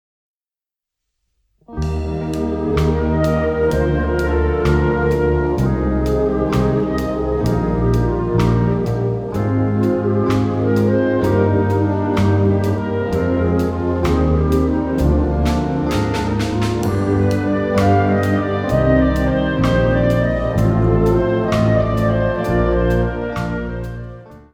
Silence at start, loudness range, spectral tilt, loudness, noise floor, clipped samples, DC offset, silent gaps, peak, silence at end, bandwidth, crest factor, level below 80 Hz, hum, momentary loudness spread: 1.7 s; 2 LU; -8 dB/octave; -17 LUFS; under -90 dBFS; under 0.1%; under 0.1%; none; -2 dBFS; 0.15 s; 15.5 kHz; 14 dB; -26 dBFS; none; 5 LU